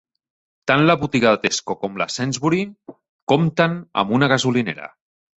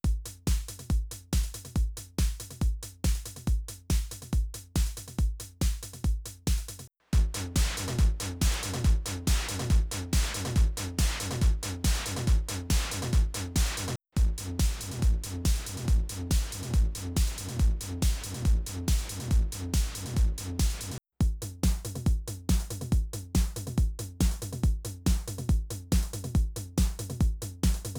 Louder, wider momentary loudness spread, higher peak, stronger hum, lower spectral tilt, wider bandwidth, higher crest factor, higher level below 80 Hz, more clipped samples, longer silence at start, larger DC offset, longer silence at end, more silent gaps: first, -19 LUFS vs -31 LUFS; first, 12 LU vs 4 LU; first, -2 dBFS vs -12 dBFS; neither; about the same, -5 dB/octave vs -4.5 dB/octave; second, 8.2 kHz vs over 20 kHz; about the same, 18 dB vs 16 dB; second, -56 dBFS vs -30 dBFS; neither; first, 0.65 s vs 0.05 s; neither; first, 0.5 s vs 0 s; first, 3.09-3.27 s vs none